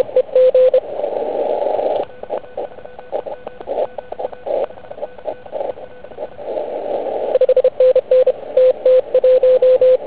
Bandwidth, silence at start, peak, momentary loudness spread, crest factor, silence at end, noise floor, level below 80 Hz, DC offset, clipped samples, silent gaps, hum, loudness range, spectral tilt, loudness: 4 kHz; 0 s; -2 dBFS; 18 LU; 14 dB; 0 s; -35 dBFS; -56 dBFS; 1%; under 0.1%; none; none; 12 LU; -8.5 dB/octave; -16 LUFS